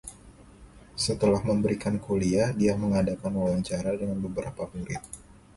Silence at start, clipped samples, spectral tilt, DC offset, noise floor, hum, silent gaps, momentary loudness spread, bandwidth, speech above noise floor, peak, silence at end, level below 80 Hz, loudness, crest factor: 0.05 s; under 0.1%; -6 dB/octave; under 0.1%; -51 dBFS; none; none; 13 LU; 11.5 kHz; 24 dB; -12 dBFS; 0.25 s; -48 dBFS; -28 LUFS; 16 dB